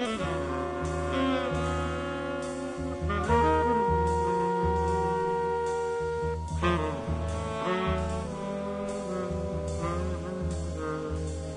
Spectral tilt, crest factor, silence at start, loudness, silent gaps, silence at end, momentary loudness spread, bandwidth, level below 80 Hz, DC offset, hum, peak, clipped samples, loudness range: -6.5 dB/octave; 16 dB; 0 s; -30 LUFS; none; 0 s; 8 LU; 11 kHz; -42 dBFS; under 0.1%; none; -12 dBFS; under 0.1%; 5 LU